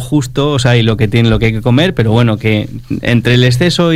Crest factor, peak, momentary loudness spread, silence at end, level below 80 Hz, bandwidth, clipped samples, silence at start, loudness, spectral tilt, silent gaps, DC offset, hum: 10 dB; 0 dBFS; 5 LU; 0 s; -30 dBFS; 14 kHz; 0.2%; 0 s; -11 LUFS; -6.5 dB/octave; none; under 0.1%; none